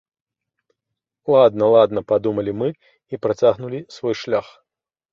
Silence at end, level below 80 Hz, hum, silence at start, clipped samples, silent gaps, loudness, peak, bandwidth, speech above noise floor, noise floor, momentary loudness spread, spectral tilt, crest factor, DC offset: 0.7 s; -58 dBFS; none; 1.25 s; under 0.1%; none; -19 LUFS; -2 dBFS; 7.2 kHz; 66 dB; -84 dBFS; 13 LU; -7 dB/octave; 18 dB; under 0.1%